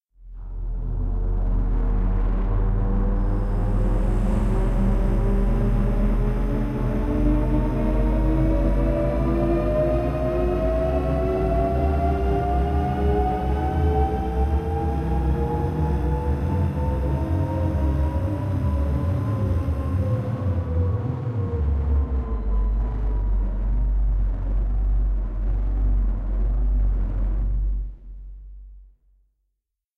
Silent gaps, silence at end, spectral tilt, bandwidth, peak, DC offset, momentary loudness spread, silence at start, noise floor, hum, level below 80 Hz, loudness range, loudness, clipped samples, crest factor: none; 1.15 s; -9.5 dB/octave; 5.2 kHz; -8 dBFS; under 0.1%; 5 LU; 0.2 s; -79 dBFS; none; -24 dBFS; 3 LU; -24 LUFS; under 0.1%; 12 dB